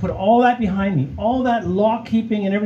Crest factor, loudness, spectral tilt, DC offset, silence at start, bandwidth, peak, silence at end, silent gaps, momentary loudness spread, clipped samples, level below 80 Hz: 14 dB; -18 LUFS; -8.5 dB/octave; under 0.1%; 0 s; 7 kHz; -4 dBFS; 0 s; none; 6 LU; under 0.1%; -42 dBFS